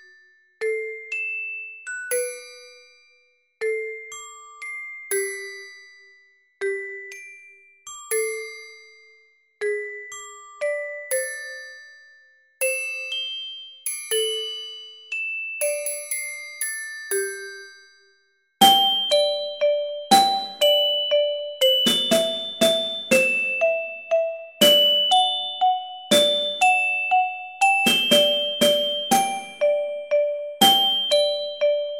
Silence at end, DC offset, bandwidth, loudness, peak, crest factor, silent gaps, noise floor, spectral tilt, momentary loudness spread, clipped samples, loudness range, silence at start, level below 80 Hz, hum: 0 s; under 0.1%; 16.5 kHz; -21 LUFS; -2 dBFS; 22 dB; none; -64 dBFS; -1 dB/octave; 18 LU; under 0.1%; 13 LU; 0.6 s; -70 dBFS; none